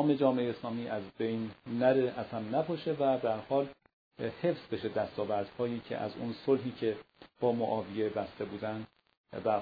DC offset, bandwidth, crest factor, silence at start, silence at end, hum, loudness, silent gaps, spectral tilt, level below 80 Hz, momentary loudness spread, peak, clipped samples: under 0.1%; 5 kHz; 20 dB; 0 s; 0 s; none; -34 LUFS; 3.93-4.11 s, 9.17-9.24 s; -5.5 dB/octave; -70 dBFS; 10 LU; -14 dBFS; under 0.1%